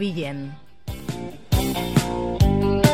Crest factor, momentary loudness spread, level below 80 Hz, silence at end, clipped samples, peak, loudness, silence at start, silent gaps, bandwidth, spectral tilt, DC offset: 18 dB; 16 LU; -30 dBFS; 0 s; under 0.1%; -4 dBFS; -23 LUFS; 0 s; none; 17 kHz; -6 dB/octave; 0.8%